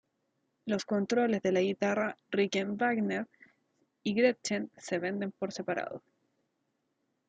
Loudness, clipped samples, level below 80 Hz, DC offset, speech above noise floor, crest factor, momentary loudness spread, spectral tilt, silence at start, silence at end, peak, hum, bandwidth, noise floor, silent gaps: -32 LUFS; under 0.1%; -78 dBFS; under 0.1%; 49 dB; 20 dB; 9 LU; -5 dB/octave; 0.65 s; 1.3 s; -14 dBFS; none; 9.2 kHz; -80 dBFS; none